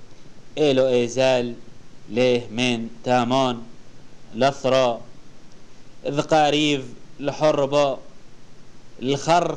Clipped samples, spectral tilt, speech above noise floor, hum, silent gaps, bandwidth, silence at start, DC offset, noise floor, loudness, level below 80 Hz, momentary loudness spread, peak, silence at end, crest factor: under 0.1%; -5 dB/octave; 22 dB; none; none; 10.5 kHz; 0 s; 1%; -43 dBFS; -21 LUFS; -50 dBFS; 14 LU; -6 dBFS; 0 s; 16 dB